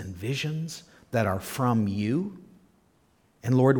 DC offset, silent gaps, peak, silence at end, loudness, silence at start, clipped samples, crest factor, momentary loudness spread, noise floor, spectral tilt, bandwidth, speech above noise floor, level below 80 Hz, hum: under 0.1%; none; -8 dBFS; 0 s; -28 LUFS; 0 s; under 0.1%; 20 dB; 12 LU; -65 dBFS; -6.5 dB/octave; 19 kHz; 39 dB; -60 dBFS; none